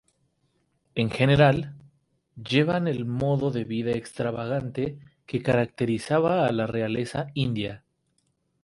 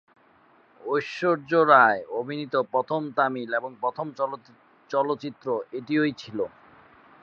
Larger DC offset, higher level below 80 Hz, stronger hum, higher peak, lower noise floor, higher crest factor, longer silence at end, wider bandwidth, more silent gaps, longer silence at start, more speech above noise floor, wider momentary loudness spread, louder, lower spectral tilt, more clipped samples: neither; first, -54 dBFS vs -74 dBFS; neither; about the same, -6 dBFS vs -4 dBFS; first, -72 dBFS vs -59 dBFS; about the same, 20 dB vs 22 dB; about the same, 0.85 s vs 0.75 s; first, 11.5 kHz vs 7.2 kHz; neither; about the same, 0.95 s vs 0.85 s; first, 47 dB vs 34 dB; second, 10 LU vs 14 LU; about the same, -25 LUFS vs -25 LUFS; about the same, -7 dB/octave vs -6.5 dB/octave; neither